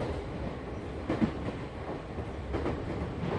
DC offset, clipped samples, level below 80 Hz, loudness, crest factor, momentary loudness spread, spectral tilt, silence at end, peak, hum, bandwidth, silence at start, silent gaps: under 0.1%; under 0.1%; -42 dBFS; -36 LUFS; 20 dB; 8 LU; -8 dB/octave; 0 s; -14 dBFS; none; 10.5 kHz; 0 s; none